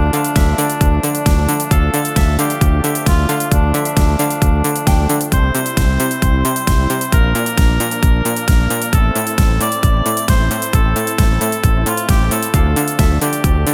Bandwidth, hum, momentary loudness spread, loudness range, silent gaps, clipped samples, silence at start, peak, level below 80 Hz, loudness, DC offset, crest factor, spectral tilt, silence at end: 18.5 kHz; none; 1 LU; 0 LU; none; under 0.1%; 0 s; 0 dBFS; -16 dBFS; -15 LUFS; under 0.1%; 14 dB; -5 dB/octave; 0 s